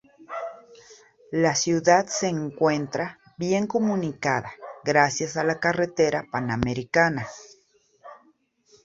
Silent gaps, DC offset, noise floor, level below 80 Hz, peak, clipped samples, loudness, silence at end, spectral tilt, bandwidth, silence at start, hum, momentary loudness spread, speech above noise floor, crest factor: none; under 0.1%; -63 dBFS; -56 dBFS; -4 dBFS; under 0.1%; -24 LUFS; 0.7 s; -4.5 dB/octave; 8 kHz; 0.2 s; none; 14 LU; 39 dB; 22 dB